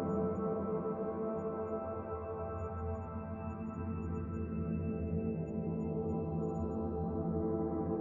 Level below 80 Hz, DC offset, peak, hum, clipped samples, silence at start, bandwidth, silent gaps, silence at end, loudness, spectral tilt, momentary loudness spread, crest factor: -56 dBFS; under 0.1%; -24 dBFS; none; under 0.1%; 0 s; 7 kHz; none; 0 s; -38 LUFS; -12 dB/octave; 6 LU; 14 dB